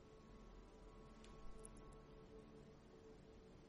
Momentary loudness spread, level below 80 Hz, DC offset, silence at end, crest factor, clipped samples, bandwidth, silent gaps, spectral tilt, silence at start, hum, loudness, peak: 4 LU; -66 dBFS; under 0.1%; 0 s; 22 dB; under 0.1%; 11 kHz; none; -5.5 dB/octave; 0 s; none; -63 LUFS; -38 dBFS